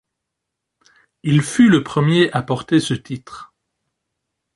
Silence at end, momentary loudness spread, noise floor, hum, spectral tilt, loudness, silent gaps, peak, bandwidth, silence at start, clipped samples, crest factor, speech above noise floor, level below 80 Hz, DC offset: 1.1 s; 18 LU; -80 dBFS; none; -6 dB/octave; -17 LUFS; none; -2 dBFS; 11.5 kHz; 1.25 s; under 0.1%; 18 dB; 64 dB; -56 dBFS; under 0.1%